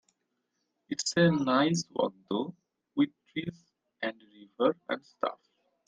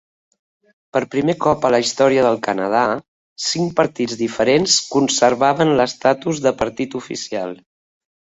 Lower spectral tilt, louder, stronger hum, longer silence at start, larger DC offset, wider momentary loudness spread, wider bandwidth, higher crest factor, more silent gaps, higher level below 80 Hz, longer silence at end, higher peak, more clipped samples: about the same, -5 dB/octave vs -4 dB/octave; second, -31 LUFS vs -18 LUFS; neither; about the same, 0.9 s vs 0.95 s; neither; about the same, 13 LU vs 11 LU; first, 9.8 kHz vs 8.2 kHz; about the same, 20 dB vs 18 dB; second, none vs 3.08-3.36 s; second, -72 dBFS vs -54 dBFS; second, 0.55 s vs 0.75 s; second, -12 dBFS vs -2 dBFS; neither